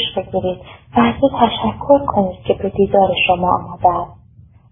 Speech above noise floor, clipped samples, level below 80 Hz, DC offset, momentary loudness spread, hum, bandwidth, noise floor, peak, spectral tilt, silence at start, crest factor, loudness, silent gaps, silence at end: 29 dB; under 0.1%; -40 dBFS; under 0.1%; 8 LU; none; 3.8 kHz; -45 dBFS; 0 dBFS; -11 dB/octave; 0 s; 16 dB; -16 LUFS; none; 0.6 s